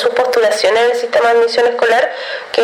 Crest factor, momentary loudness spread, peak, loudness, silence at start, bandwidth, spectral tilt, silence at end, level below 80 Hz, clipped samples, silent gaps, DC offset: 12 dB; 6 LU; -2 dBFS; -13 LUFS; 0 s; 13.5 kHz; -1.5 dB/octave; 0 s; -62 dBFS; under 0.1%; none; under 0.1%